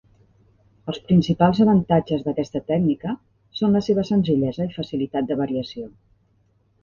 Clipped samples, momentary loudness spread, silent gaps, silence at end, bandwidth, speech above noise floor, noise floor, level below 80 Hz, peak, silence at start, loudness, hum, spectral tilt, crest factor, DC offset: under 0.1%; 16 LU; none; 0.95 s; 7 kHz; 42 dB; -63 dBFS; -52 dBFS; -2 dBFS; 0.85 s; -21 LUFS; none; -8.5 dB/octave; 20 dB; under 0.1%